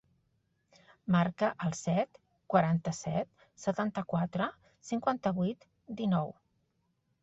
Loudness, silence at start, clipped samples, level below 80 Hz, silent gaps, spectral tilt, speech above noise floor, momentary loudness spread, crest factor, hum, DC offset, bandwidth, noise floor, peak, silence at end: -33 LUFS; 1.05 s; under 0.1%; -68 dBFS; none; -6.5 dB/octave; 46 dB; 12 LU; 22 dB; none; under 0.1%; 8 kHz; -77 dBFS; -12 dBFS; 0.9 s